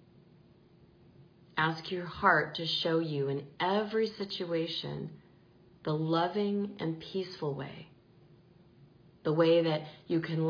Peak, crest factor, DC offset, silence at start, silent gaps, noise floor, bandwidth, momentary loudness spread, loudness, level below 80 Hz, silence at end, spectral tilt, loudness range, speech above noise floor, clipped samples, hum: -12 dBFS; 22 dB; under 0.1%; 1.2 s; none; -60 dBFS; 5.2 kHz; 13 LU; -32 LUFS; -70 dBFS; 0 s; -7 dB/octave; 4 LU; 29 dB; under 0.1%; none